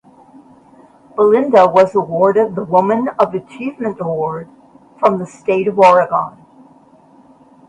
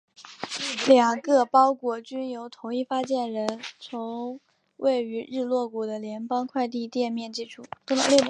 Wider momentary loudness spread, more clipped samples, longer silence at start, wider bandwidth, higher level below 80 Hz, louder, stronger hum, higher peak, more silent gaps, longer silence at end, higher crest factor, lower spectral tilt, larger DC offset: second, 13 LU vs 17 LU; neither; first, 1.15 s vs 0.2 s; about the same, 10 kHz vs 11 kHz; first, -58 dBFS vs -76 dBFS; first, -14 LUFS vs -26 LUFS; neither; first, 0 dBFS vs -4 dBFS; neither; first, 1.4 s vs 0 s; second, 16 dB vs 22 dB; first, -7 dB/octave vs -3 dB/octave; neither